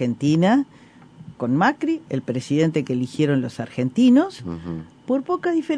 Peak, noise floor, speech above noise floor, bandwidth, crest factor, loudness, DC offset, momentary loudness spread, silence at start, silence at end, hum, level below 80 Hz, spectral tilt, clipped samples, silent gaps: -6 dBFS; -43 dBFS; 23 dB; 10.5 kHz; 16 dB; -21 LUFS; under 0.1%; 14 LU; 0 s; 0 s; none; -58 dBFS; -7 dB/octave; under 0.1%; none